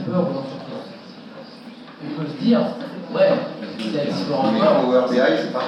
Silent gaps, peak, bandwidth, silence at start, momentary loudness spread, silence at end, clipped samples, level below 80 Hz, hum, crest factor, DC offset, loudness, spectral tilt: none; -6 dBFS; 9.8 kHz; 0 s; 22 LU; 0 s; under 0.1%; -76 dBFS; none; 16 dB; under 0.1%; -20 LUFS; -7 dB/octave